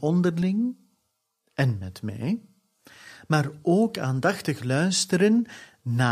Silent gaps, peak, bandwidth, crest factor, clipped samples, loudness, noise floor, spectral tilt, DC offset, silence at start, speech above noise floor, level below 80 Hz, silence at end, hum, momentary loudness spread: none; -6 dBFS; 15 kHz; 18 dB; under 0.1%; -25 LUFS; -76 dBFS; -5.5 dB/octave; under 0.1%; 0 s; 52 dB; -64 dBFS; 0 s; none; 12 LU